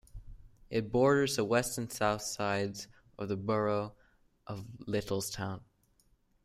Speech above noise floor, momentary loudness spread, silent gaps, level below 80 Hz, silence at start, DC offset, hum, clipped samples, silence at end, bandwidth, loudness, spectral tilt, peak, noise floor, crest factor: 38 dB; 16 LU; none; -58 dBFS; 0.15 s; under 0.1%; none; under 0.1%; 0.8 s; 15.5 kHz; -33 LUFS; -4.5 dB/octave; -14 dBFS; -70 dBFS; 20 dB